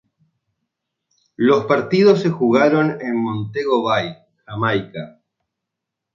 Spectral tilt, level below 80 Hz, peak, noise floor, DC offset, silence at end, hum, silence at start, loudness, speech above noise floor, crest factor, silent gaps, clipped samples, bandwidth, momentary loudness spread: -7 dB/octave; -60 dBFS; -2 dBFS; -82 dBFS; under 0.1%; 1.05 s; none; 1.4 s; -17 LUFS; 65 dB; 18 dB; none; under 0.1%; 7.4 kHz; 16 LU